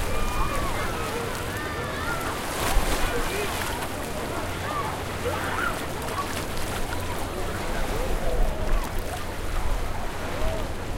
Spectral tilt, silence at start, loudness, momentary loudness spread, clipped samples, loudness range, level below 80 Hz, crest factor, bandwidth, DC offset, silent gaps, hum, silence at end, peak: -4 dB/octave; 0 s; -29 LUFS; 5 LU; under 0.1%; 2 LU; -30 dBFS; 18 dB; 17 kHz; under 0.1%; none; none; 0 s; -8 dBFS